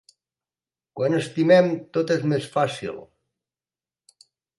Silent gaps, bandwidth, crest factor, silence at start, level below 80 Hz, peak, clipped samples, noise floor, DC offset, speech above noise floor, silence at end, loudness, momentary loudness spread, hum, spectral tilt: none; 11.5 kHz; 20 dB; 0.95 s; -68 dBFS; -4 dBFS; under 0.1%; under -90 dBFS; under 0.1%; over 69 dB; 1.55 s; -22 LUFS; 17 LU; none; -6.5 dB/octave